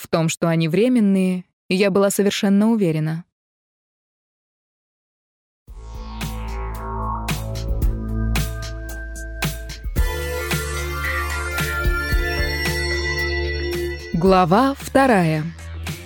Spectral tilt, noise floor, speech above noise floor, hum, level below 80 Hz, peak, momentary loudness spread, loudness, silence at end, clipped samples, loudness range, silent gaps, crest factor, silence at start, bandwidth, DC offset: -5.5 dB/octave; under -90 dBFS; over 73 dB; none; -28 dBFS; -2 dBFS; 14 LU; -21 LUFS; 0 s; under 0.1%; 13 LU; 1.53-1.69 s, 3.32-5.66 s; 18 dB; 0 s; over 20 kHz; under 0.1%